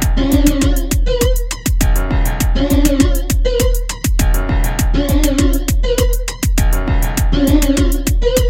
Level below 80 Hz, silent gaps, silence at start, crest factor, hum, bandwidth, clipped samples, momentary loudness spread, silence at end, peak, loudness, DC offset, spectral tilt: -14 dBFS; none; 0 s; 12 dB; none; 17 kHz; under 0.1%; 4 LU; 0 s; 0 dBFS; -16 LUFS; 0.2%; -5 dB/octave